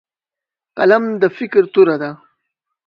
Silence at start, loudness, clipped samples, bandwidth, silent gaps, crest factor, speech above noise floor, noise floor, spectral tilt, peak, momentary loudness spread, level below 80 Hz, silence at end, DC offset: 0.75 s; -14 LUFS; under 0.1%; 5.4 kHz; none; 16 dB; 74 dB; -88 dBFS; -8 dB/octave; 0 dBFS; 12 LU; -66 dBFS; 0.7 s; under 0.1%